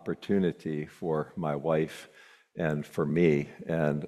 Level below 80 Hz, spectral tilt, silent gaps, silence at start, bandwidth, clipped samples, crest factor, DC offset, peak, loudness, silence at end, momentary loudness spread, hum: -62 dBFS; -8 dB/octave; none; 0.05 s; 13.5 kHz; under 0.1%; 18 dB; under 0.1%; -12 dBFS; -30 LUFS; 0 s; 10 LU; none